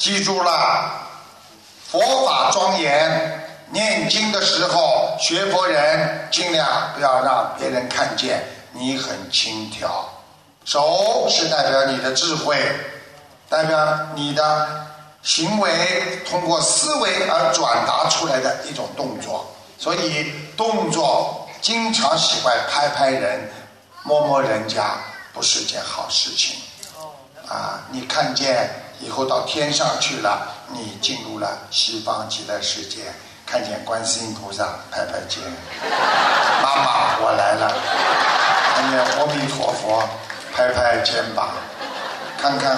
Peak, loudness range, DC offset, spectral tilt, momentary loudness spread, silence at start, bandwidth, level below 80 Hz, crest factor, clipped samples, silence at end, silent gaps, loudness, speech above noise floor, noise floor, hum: -2 dBFS; 5 LU; under 0.1%; -2 dB/octave; 12 LU; 0 s; 13.5 kHz; -62 dBFS; 18 dB; under 0.1%; 0 s; none; -19 LUFS; 27 dB; -46 dBFS; none